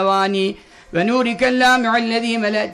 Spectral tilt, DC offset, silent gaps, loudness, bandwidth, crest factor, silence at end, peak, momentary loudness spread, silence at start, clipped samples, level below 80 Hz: -4.5 dB/octave; under 0.1%; none; -17 LUFS; 13 kHz; 12 dB; 0 s; -6 dBFS; 9 LU; 0 s; under 0.1%; -52 dBFS